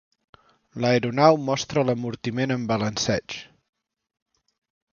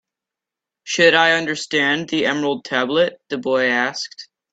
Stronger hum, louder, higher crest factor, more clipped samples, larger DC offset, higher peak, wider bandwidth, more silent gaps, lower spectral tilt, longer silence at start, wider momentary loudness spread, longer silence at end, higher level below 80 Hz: neither; second, -23 LUFS vs -18 LUFS; about the same, 22 dB vs 20 dB; neither; neither; about the same, -2 dBFS vs 0 dBFS; second, 7.2 kHz vs 9 kHz; neither; first, -5 dB/octave vs -3 dB/octave; about the same, 0.75 s vs 0.85 s; about the same, 11 LU vs 11 LU; first, 1.5 s vs 0.3 s; first, -58 dBFS vs -64 dBFS